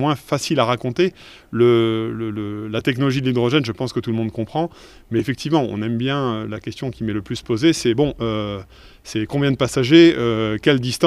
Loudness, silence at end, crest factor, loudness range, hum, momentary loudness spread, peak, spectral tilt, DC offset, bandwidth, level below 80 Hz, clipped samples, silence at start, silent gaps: -20 LUFS; 0 s; 18 dB; 5 LU; none; 11 LU; 0 dBFS; -6 dB/octave; under 0.1%; 13 kHz; -48 dBFS; under 0.1%; 0 s; none